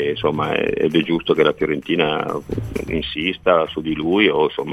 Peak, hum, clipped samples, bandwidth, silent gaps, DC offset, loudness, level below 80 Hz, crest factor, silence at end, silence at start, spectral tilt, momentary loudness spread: -2 dBFS; none; under 0.1%; 13.5 kHz; none; 0.1%; -19 LUFS; -42 dBFS; 18 dB; 0 s; 0 s; -6.5 dB/octave; 8 LU